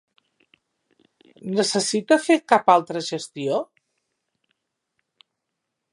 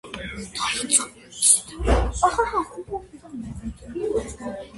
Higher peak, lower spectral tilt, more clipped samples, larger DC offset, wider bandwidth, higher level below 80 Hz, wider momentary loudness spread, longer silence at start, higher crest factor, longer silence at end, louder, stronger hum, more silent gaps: about the same, -2 dBFS vs -2 dBFS; about the same, -3.5 dB/octave vs -2.5 dB/octave; neither; neither; about the same, 11.5 kHz vs 12 kHz; second, -78 dBFS vs -34 dBFS; second, 12 LU vs 18 LU; first, 1.45 s vs 0.05 s; about the same, 24 dB vs 22 dB; first, 2.3 s vs 0 s; about the same, -21 LUFS vs -22 LUFS; neither; neither